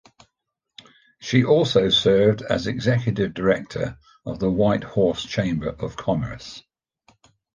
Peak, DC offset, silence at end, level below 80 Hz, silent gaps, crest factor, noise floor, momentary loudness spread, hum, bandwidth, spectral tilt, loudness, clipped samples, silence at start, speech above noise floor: -4 dBFS; under 0.1%; 0.95 s; -48 dBFS; none; 18 dB; -79 dBFS; 16 LU; none; 9.6 kHz; -6 dB/octave; -21 LUFS; under 0.1%; 1.2 s; 58 dB